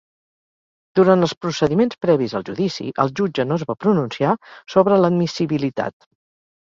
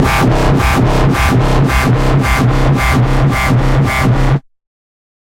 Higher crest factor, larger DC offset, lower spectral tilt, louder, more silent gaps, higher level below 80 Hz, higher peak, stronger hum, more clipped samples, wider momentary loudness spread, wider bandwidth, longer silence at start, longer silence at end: first, 20 dB vs 10 dB; neither; about the same, -7 dB/octave vs -6.5 dB/octave; second, -19 LUFS vs -12 LUFS; first, 1.37-1.41 s vs none; second, -58 dBFS vs -18 dBFS; about the same, 0 dBFS vs 0 dBFS; neither; neither; first, 8 LU vs 1 LU; second, 7.6 kHz vs 16.5 kHz; first, 0.95 s vs 0 s; about the same, 0.8 s vs 0.85 s